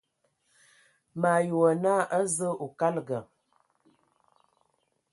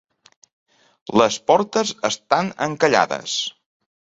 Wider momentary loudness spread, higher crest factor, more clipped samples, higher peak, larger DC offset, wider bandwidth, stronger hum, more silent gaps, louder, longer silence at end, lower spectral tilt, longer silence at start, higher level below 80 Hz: first, 12 LU vs 7 LU; about the same, 20 dB vs 20 dB; neither; second, -10 dBFS vs -2 dBFS; neither; first, 11.5 kHz vs 8.2 kHz; neither; neither; second, -27 LUFS vs -20 LUFS; first, 1.9 s vs 0.65 s; first, -5.5 dB/octave vs -3.5 dB/octave; about the same, 1.15 s vs 1.1 s; second, -76 dBFS vs -62 dBFS